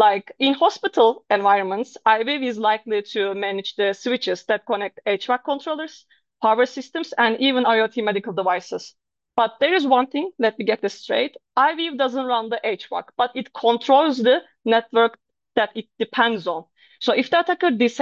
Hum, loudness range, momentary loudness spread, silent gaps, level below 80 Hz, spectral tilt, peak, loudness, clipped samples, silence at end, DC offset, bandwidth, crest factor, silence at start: none; 3 LU; 8 LU; none; -74 dBFS; -4.5 dB/octave; -4 dBFS; -21 LUFS; under 0.1%; 0 s; under 0.1%; 7.6 kHz; 18 dB; 0 s